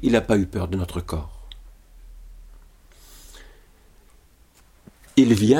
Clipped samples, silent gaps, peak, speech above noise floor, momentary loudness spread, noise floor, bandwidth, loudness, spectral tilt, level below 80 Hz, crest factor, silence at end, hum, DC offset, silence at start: under 0.1%; none; -4 dBFS; 35 dB; 28 LU; -54 dBFS; 16 kHz; -22 LUFS; -6.5 dB/octave; -42 dBFS; 20 dB; 0 s; none; under 0.1%; 0 s